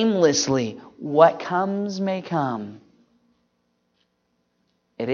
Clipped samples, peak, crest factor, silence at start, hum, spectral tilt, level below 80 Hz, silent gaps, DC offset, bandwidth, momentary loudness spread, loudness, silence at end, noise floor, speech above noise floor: under 0.1%; 0 dBFS; 22 dB; 0 s; 60 Hz at -55 dBFS; -4.5 dB/octave; -66 dBFS; none; under 0.1%; 7.4 kHz; 15 LU; -22 LUFS; 0 s; -71 dBFS; 50 dB